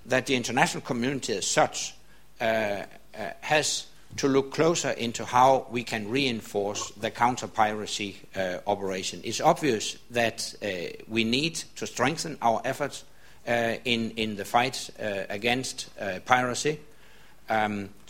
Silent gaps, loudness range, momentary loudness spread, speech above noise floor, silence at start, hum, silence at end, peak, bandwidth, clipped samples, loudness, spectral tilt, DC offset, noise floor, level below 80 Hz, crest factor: none; 3 LU; 10 LU; 28 dB; 0.05 s; none; 0.15 s; -2 dBFS; 16.5 kHz; under 0.1%; -27 LUFS; -3.5 dB/octave; 0.4%; -55 dBFS; -60 dBFS; 26 dB